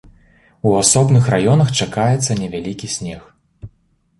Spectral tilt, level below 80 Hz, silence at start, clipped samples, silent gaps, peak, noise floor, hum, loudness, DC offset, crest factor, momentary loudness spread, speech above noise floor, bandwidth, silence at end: -5 dB/octave; -46 dBFS; 0.65 s; under 0.1%; none; 0 dBFS; -59 dBFS; none; -16 LUFS; under 0.1%; 18 dB; 13 LU; 44 dB; 11.5 kHz; 0.55 s